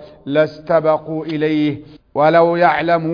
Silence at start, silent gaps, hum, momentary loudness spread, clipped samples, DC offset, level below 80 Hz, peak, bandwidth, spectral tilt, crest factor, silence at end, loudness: 0 s; none; none; 10 LU; under 0.1%; under 0.1%; -54 dBFS; 0 dBFS; 5.2 kHz; -8.5 dB/octave; 16 dB; 0 s; -16 LUFS